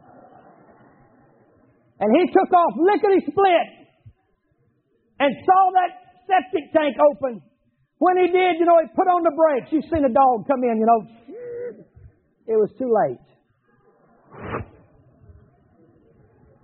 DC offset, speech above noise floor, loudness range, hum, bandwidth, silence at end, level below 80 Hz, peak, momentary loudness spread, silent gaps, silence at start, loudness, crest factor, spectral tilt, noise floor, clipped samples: under 0.1%; 48 dB; 8 LU; none; 4.3 kHz; 2 s; -56 dBFS; -4 dBFS; 16 LU; none; 2 s; -19 LUFS; 16 dB; -4 dB/octave; -66 dBFS; under 0.1%